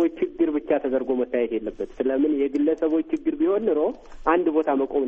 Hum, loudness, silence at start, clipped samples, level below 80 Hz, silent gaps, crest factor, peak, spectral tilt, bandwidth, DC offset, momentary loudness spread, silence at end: none; -24 LUFS; 0 s; under 0.1%; -50 dBFS; none; 18 dB; -4 dBFS; -7.5 dB/octave; 6.4 kHz; under 0.1%; 6 LU; 0 s